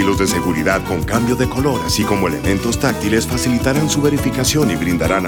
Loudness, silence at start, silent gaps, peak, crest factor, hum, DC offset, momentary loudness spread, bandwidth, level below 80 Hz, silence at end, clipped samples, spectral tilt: -16 LUFS; 0 s; none; 0 dBFS; 16 dB; none; under 0.1%; 2 LU; over 20 kHz; -32 dBFS; 0 s; under 0.1%; -5 dB/octave